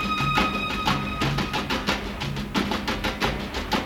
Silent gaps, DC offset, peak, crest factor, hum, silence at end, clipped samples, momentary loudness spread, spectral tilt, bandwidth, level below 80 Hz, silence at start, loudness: none; under 0.1%; -8 dBFS; 18 dB; none; 0 s; under 0.1%; 5 LU; -4.5 dB/octave; 18 kHz; -38 dBFS; 0 s; -25 LUFS